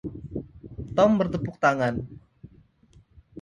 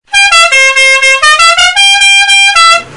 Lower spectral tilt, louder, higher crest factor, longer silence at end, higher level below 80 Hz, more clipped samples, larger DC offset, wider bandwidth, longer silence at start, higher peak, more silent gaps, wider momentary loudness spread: first, -7 dB/octave vs 3 dB/octave; second, -24 LUFS vs -2 LUFS; first, 20 dB vs 6 dB; about the same, 0 s vs 0 s; second, -50 dBFS vs -40 dBFS; second, under 0.1% vs 1%; neither; second, 9.6 kHz vs 12 kHz; about the same, 0.05 s vs 0.1 s; second, -6 dBFS vs 0 dBFS; neither; first, 20 LU vs 1 LU